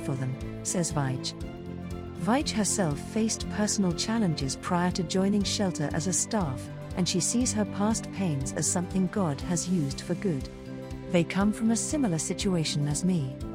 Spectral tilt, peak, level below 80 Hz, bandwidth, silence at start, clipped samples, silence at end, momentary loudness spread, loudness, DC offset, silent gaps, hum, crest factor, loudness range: -4.5 dB/octave; -10 dBFS; -48 dBFS; 16 kHz; 0 s; under 0.1%; 0 s; 9 LU; -28 LUFS; under 0.1%; none; none; 18 dB; 2 LU